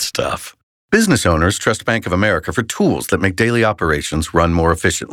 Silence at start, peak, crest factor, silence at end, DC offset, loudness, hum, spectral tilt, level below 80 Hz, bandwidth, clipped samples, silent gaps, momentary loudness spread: 0 s; -2 dBFS; 14 dB; 0 s; under 0.1%; -16 LUFS; none; -4.5 dB/octave; -36 dBFS; 17 kHz; under 0.1%; 0.63-0.89 s; 6 LU